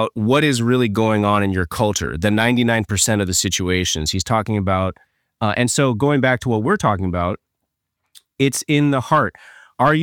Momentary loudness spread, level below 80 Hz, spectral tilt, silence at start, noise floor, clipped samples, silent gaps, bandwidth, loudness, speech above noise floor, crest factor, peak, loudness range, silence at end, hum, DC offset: 5 LU; -42 dBFS; -4.5 dB/octave; 0 s; -77 dBFS; under 0.1%; none; 18.5 kHz; -18 LUFS; 59 dB; 16 dB; -2 dBFS; 2 LU; 0 s; none; under 0.1%